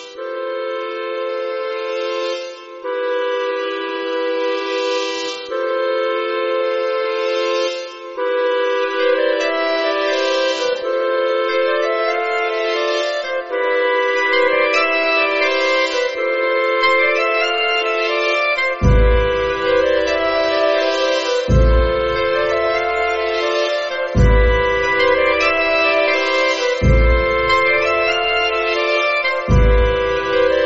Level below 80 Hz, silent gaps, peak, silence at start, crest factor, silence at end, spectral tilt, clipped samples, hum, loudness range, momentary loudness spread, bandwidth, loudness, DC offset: -26 dBFS; none; -4 dBFS; 0 s; 14 dB; 0 s; -3 dB/octave; under 0.1%; none; 6 LU; 8 LU; 7.8 kHz; -17 LUFS; under 0.1%